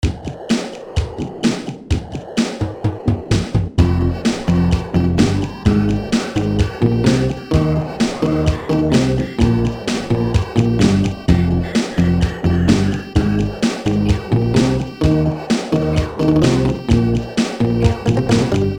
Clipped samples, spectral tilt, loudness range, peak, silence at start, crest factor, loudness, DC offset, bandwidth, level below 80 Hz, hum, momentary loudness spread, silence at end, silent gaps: under 0.1%; -6.5 dB/octave; 3 LU; 0 dBFS; 0 s; 16 dB; -17 LUFS; 0.2%; 17.5 kHz; -28 dBFS; none; 6 LU; 0 s; none